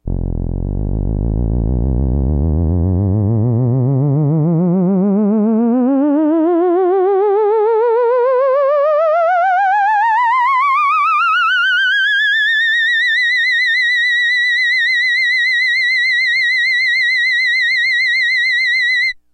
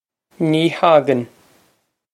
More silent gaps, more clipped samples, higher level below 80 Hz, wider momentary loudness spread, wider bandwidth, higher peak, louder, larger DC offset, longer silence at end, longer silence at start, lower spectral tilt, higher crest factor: neither; neither; first, -26 dBFS vs -68 dBFS; second, 5 LU vs 10 LU; about the same, 11 kHz vs 12 kHz; second, -6 dBFS vs -2 dBFS; first, -13 LUFS vs -16 LUFS; neither; second, 0.2 s vs 0.9 s; second, 0.05 s vs 0.4 s; about the same, -6 dB/octave vs -6.5 dB/octave; second, 8 dB vs 18 dB